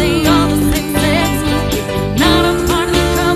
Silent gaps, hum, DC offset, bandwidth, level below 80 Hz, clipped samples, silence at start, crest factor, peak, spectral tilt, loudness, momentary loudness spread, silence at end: none; none; under 0.1%; 14 kHz; -24 dBFS; under 0.1%; 0 s; 14 dB; 0 dBFS; -5 dB/octave; -13 LUFS; 5 LU; 0 s